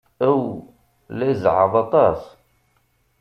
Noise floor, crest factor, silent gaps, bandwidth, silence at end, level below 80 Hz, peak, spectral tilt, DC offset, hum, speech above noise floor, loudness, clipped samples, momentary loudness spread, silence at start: -64 dBFS; 18 dB; none; 6.4 kHz; 0.95 s; -54 dBFS; -2 dBFS; -9 dB/octave; under 0.1%; none; 46 dB; -19 LUFS; under 0.1%; 15 LU; 0.2 s